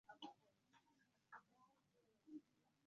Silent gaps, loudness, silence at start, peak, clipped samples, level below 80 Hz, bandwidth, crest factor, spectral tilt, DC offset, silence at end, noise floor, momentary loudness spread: none; -63 LUFS; 0.05 s; -42 dBFS; under 0.1%; under -90 dBFS; 7 kHz; 24 dB; -1.5 dB/octave; under 0.1%; 0.15 s; -82 dBFS; 5 LU